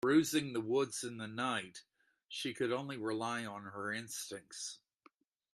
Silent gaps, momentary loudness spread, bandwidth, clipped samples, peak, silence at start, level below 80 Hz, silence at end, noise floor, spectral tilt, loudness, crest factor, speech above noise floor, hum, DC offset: none; 11 LU; 13.5 kHz; under 0.1%; -18 dBFS; 0.05 s; -80 dBFS; 0.8 s; -70 dBFS; -4 dB/octave; -38 LUFS; 20 dB; 32 dB; none; under 0.1%